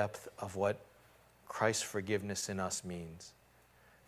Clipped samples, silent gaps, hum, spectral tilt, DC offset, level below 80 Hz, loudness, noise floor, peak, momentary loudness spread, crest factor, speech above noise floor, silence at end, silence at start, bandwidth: under 0.1%; none; none; -3.5 dB/octave; under 0.1%; -64 dBFS; -38 LUFS; -66 dBFS; -18 dBFS; 14 LU; 22 dB; 28 dB; 0.75 s; 0 s; 16 kHz